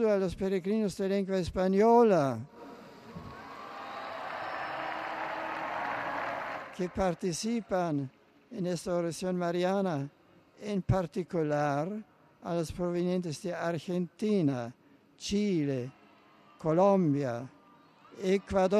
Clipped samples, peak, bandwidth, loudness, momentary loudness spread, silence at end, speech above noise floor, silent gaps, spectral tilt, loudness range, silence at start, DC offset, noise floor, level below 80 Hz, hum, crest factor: under 0.1%; -14 dBFS; 13 kHz; -31 LUFS; 18 LU; 0 s; 30 dB; none; -6.5 dB/octave; 7 LU; 0 s; under 0.1%; -59 dBFS; -56 dBFS; none; 18 dB